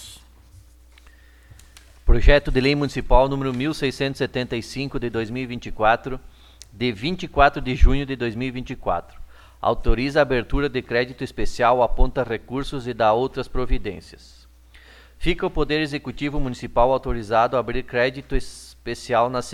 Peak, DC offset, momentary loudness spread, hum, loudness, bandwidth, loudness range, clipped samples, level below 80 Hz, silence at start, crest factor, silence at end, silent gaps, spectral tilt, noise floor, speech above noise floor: 0 dBFS; under 0.1%; 11 LU; none; -23 LUFS; 11.5 kHz; 4 LU; under 0.1%; -26 dBFS; 0 s; 22 dB; 0 s; none; -6 dB/octave; -49 dBFS; 28 dB